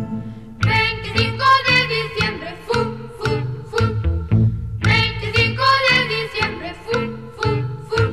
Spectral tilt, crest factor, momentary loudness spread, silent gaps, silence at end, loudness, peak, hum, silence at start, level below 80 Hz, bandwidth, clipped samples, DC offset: -5.5 dB/octave; 16 dB; 10 LU; none; 0 s; -18 LUFS; -2 dBFS; none; 0 s; -34 dBFS; 12.5 kHz; under 0.1%; 0.5%